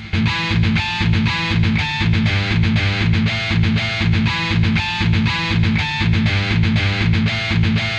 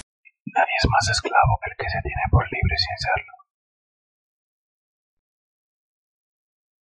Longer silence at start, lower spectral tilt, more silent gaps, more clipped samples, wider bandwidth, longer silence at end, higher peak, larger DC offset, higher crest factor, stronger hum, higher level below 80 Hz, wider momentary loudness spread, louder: second, 0 s vs 0.45 s; first, -6 dB/octave vs -4 dB/octave; neither; neither; about the same, 8.2 kHz vs 9 kHz; second, 0 s vs 3.5 s; about the same, -4 dBFS vs -4 dBFS; neither; second, 14 dB vs 22 dB; neither; first, -30 dBFS vs -36 dBFS; second, 1 LU vs 8 LU; first, -17 LUFS vs -22 LUFS